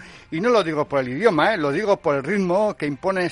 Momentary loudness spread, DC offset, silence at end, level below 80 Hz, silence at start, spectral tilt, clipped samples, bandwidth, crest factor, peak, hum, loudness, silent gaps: 5 LU; under 0.1%; 0 s; -56 dBFS; 0 s; -6 dB/octave; under 0.1%; 11.5 kHz; 18 dB; -4 dBFS; none; -21 LUFS; none